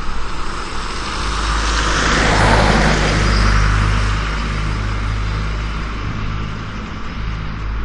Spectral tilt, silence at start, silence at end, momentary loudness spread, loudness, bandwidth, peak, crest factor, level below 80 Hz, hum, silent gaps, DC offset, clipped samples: -4.5 dB/octave; 0 s; 0 s; 13 LU; -18 LUFS; 10.5 kHz; 0 dBFS; 16 dB; -20 dBFS; none; none; under 0.1%; under 0.1%